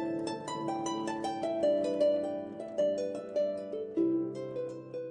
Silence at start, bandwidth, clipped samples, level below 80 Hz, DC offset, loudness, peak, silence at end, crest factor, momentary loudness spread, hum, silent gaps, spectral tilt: 0 s; 10 kHz; under 0.1%; -74 dBFS; under 0.1%; -33 LUFS; -18 dBFS; 0 s; 16 dB; 9 LU; none; none; -5.5 dB/octave